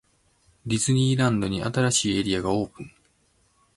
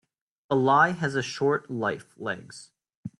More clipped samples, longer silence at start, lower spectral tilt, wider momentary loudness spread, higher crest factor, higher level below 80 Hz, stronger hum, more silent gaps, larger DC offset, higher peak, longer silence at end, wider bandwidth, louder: neither; first, 0.65 s vs 0.5 s; about the same, -4.5 dB/octave vs -5.5 dB/octave; second, 16 LU vs 20 LU; about the same, 18 dB vs 20 dB; first, -50 dBFS vs -68 dBFS; neither; second, none vs 2.95-3.03 s; neither; about the same, -8 dBFS vs -8 dBFS; first, 0.9 s vs 0.1 s; about the same, 11.5 kHz vs 11.5 kHz; about the same, -24 LUFS vs -26 LUFS